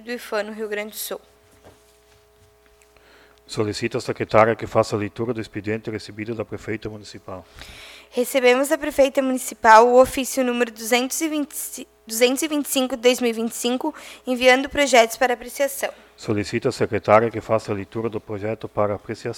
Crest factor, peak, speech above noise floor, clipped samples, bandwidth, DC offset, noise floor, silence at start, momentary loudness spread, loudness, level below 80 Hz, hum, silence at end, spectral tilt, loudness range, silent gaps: 22 dB; 0 dBFS; 34 dB; under 0.1%; 18.5 kHz; under 0.1%; -55 dBFS; 0 s; 15 LU; -21 LUFS; -54 dBFS; none; 0 s; -4 dB/octave; 12 LU; none